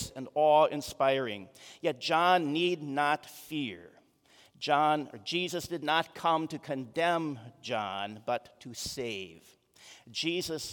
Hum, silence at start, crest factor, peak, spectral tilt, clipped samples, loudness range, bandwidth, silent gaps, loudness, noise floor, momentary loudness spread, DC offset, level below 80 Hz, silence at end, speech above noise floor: none; 0 s; 20 dB; -12 dBFS; -4 dB/octave; under 0.1%; 7 LU; 18 kHz; none; -31 LUFS; -63 dBFS; 14 LU; under 0.1%; -68 dBFS; 0 s; 32 dB